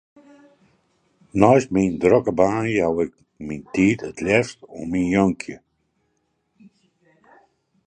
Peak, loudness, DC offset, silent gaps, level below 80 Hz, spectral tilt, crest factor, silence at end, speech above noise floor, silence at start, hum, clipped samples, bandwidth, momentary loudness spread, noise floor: 0 dBFS; -20 LUFS; under 0.1%; none; -50 dBFS; -6.5 dB/octave; 22 dB; 2.3 s; 51 dB; 1.35 s; none; under 0.1%; 9.6 kHz; 16 LU; -71 dBFS